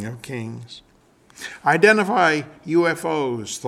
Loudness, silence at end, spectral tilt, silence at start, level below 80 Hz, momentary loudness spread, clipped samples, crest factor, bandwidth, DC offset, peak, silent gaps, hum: -19 LUFS; 0 s; -4.5 dB/octave; 0 s; -64 dBFS; 21 LU; under 0.1%; 20 dB; 14.5 kHz; under 0.1%; -2 dBFS; none; none